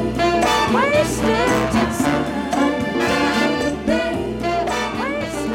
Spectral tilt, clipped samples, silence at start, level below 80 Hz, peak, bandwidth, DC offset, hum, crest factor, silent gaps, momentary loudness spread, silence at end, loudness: -4.5 dB/octave; under 0.1%; 0 s; -38 dBFS; -4 dBFS; 17 kHz; under 0.1%; none; 14 dB; none; 6 LU; 0 s; -19 LUFS